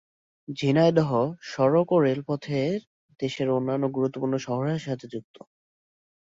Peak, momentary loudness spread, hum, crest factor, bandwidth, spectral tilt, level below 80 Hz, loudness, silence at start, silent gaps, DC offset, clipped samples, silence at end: -8 dBFS; 13 LU; none; 18 dB; 7.8 kHz; -7.5 dB/octave; -66 dBFS; -25 LUFS; 0.5 s; 2.87-3.09 s; under 0.1%; under 0.1%; 1.05 s